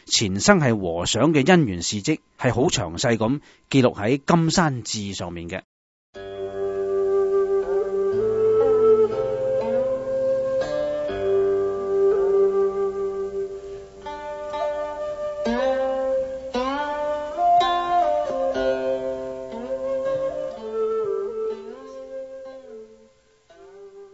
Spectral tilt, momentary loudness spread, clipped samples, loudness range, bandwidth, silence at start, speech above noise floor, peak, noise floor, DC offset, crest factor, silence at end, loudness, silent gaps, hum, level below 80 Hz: -5 dB/octave; 15 LU; under 0.1%; 7 LU; 8 kHz; 0.05 s; 35 dB; 0 dBFS; -56 dBFS; under 0.1%; 22 dB; 0.05 s; -22 LUFS; 5.64-6.13 s; none; -50 dBFS